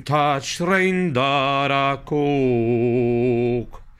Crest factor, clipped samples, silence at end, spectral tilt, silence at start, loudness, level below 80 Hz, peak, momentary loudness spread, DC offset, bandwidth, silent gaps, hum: 14 dB; under 0.1%; 0.1 s; -6 dB/octave; 0 s; -20 LUFS; -46 dBFS; -6 dBFS; 3 LU; under 0.1%; 12.5 kHz; none; none